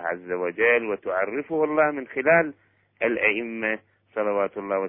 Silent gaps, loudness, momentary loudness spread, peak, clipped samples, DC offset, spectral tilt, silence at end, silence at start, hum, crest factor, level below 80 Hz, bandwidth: none; -24 LUFS; 9 LU; -6 dBFS; under 0.1%; under 0.1%; -9 dB/octave; 0 s; 0 s; none; 18 dB; -66 dBFS; 3.6 kHz